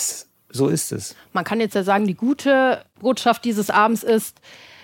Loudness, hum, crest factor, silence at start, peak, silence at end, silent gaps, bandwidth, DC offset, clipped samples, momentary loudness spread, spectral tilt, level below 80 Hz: -20 LUFS; none; 18 dB; 0 s; -4 dBFS; 0.25 s; none; 17 kHz; under 0.1%; under 0.1%; 10 LU; -4.5 dB/octave; -66 dBFS